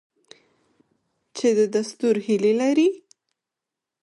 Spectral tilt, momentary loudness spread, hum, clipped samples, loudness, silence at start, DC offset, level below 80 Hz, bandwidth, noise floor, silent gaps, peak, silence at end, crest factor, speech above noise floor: -5 dB/octave; 6 LU; none; under 0.1%; -21 LUFS; 1.35 s; under 0.1%; -74 dBFS; 11.5 kHz; -86 dBFS; none; -10 dBFS; 1.05 s; 14 dB; 66 dB